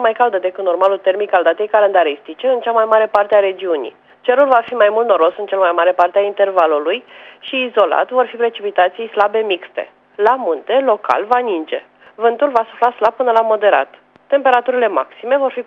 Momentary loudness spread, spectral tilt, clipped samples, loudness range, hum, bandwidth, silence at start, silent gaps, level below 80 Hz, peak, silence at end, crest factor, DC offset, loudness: 8 LU; -5 dB/octave; under 0.1%; 3 LU; none; 6 kHz; 0 s; none; -70 dBFS; 0 dBFS; 0.05 s; 14 dB; under 0.1%; -15 LUFS